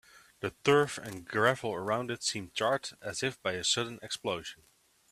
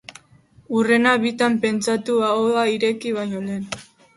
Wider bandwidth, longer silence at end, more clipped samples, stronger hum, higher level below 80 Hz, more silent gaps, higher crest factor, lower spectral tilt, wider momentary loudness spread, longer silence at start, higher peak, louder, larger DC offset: first, 14.5 kHz vs 11.5 kHz; first, 0.55 s vs 0.35 s; neither; neither; second, -68 dBFS vs -62 dBFS; neither; about the same, 22 dB vs 18 dB; second, -3 dB/octave vs -4.5 dB/octave; about the same, 12 LU vs 11 LU; about the same, 0.15 s vs 0.1 s; second, -10 dBFS vs -4 dBFS; second, -32 LUFS vs -20 LUFS; neither